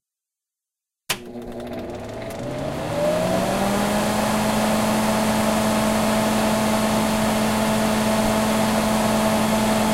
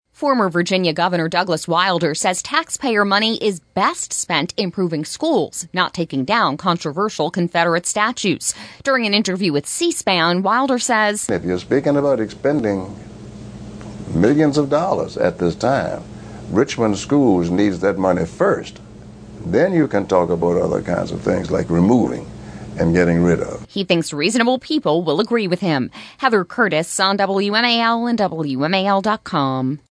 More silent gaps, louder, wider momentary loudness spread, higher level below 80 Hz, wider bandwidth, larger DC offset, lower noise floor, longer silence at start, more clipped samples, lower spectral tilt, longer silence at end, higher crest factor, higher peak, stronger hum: neither; second, -21 LUFS vs -18 LUFS; first, 11 LU vs 7 LU; about the same, -42 dBFS vs -46 dBFS; first, 16 kHz vs 11 kHz; neither; first, -87 dBFS vs -38 dBFS; first, 1.1 s vs 0.2 s; neither; about the same, -4.5 dB/octave vs -4.5 dB/octave; second, 0 s vs 0.15 s; about the same, 14 dB vs 18 dB; second, -6 dBFS vs -2 dBFS; neither